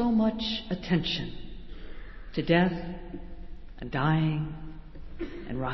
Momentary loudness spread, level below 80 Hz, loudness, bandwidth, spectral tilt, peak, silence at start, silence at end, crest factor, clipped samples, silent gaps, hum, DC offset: 22 LU; -44 dBFS; -29 LUFS; 6 kHz; -7.5 dB/octave; -10 dBFS; 0 s; 0 s; 20 dB; under 0.1%; none; none; under 0.1%